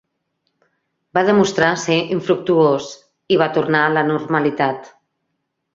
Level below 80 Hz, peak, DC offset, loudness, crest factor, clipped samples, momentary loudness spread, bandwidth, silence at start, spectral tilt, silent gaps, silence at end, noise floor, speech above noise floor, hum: -60 dBFS; -2 dBFS; under 0.1%; -17 LUFS; 18 dB; under 0.1%; 7 LU; 7.8 kHz; 1.15 s; -5.5 dB/octave; none; 0.85 s; -74 dBFS; 57 dB; none